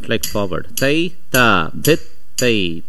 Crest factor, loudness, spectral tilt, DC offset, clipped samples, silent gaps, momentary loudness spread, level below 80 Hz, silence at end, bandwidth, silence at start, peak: 18 dB; -17 LUFS; -4 dB/octave; 10%; under 0.1%; none; 9 LU; -42 dBFS; 0.1 s; 16 kHz; 0 s; 0 dBFS